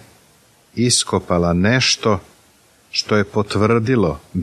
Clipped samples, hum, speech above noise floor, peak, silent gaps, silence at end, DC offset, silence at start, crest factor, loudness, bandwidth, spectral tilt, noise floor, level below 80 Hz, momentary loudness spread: under 0.1%; none; 36 dB; -2 dBFS; none; 0 s; under 0.1%; 0.75 s; 16 dB; -17 LUFS; 14.5 kHz; -4 dB/octave; -53 dBFS; -44 dBFS; 8 LU